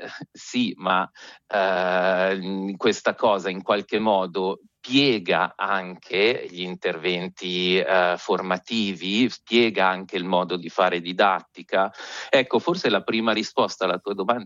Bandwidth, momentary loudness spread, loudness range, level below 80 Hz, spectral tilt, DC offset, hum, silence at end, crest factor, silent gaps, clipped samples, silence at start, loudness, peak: 7.6 kHz; 8 LU; 1 LU; -70 dBFS; -4.5 dB/octave; under 0.1%; none; 0 s; 20 dB; none; under 0.1%; 0 s; -23 LUFS; -4 dBFS